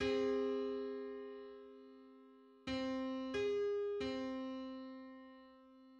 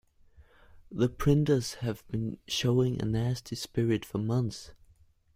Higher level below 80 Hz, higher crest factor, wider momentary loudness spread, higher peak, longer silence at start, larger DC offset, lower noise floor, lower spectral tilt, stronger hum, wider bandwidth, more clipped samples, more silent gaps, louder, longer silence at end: second, -68 dBFS vs -50 dBFS; about the same, 16 dB vs 20 dB; first, 22 LU vs 10 LU; second, -26 dBFS vs -12 dBFS; second, 0 s vs 0.4 s; neither; about the same, -63 dBFS vs -62 dBFS; about the same, -5.5 dB/octave vs -6.5 dB/octave; neither; second, 8 kHz vs 16 kHz; neither; neither; second, -41 LUFS vs -30 LUFS; second, 0 s vs 0.6 s